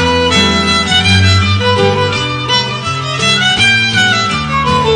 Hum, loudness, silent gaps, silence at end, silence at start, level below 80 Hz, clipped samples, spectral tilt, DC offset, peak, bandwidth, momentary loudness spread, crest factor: none; -10 LUFS; none; 0 s; 0 s; -32 dBFS; under 0.1%; -4 dB/octave; under 0.1%; 0 dBFS; 11.5 kHz; 6 LU; 10 dB